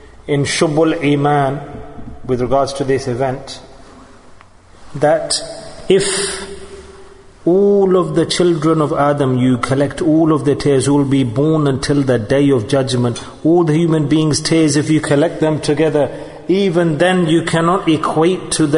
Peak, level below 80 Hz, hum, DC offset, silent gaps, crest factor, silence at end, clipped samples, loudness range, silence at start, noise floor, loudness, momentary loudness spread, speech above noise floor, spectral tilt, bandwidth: 0 dBFS; -42 dBFS; none; under 0.1%; none; 14 dB; 0 s; under 0.1%; 5 LU; 0.2 s; -41 dBFS; -15 LUFS; 9 LU; 27 dB; -5.5 dB/octave; 11 kHz